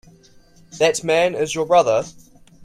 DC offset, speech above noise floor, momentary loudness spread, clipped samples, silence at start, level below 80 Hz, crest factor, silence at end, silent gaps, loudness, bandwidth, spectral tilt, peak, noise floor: under 0.1%; 32 dB; 7 LU; under 0.1%; 0.75 s; -56 dBFS; 18 dB; 0 s; none; -18 LUFS; 14.5 kHz; -3.5 dB/octave; -4 dBFS; -50 dBFS